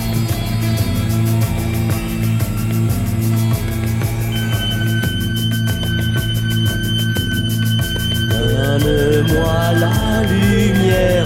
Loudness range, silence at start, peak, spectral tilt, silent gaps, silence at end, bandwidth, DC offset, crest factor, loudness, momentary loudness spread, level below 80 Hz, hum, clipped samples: 3 LU; 0 s; -2 dBFS; -5.5 dB/octave; none; 0 s; 16.5 kHz; under 0.1%; 14 dB; -17 LUFS; 5 LU; -28 dBFS; none; under 0.1%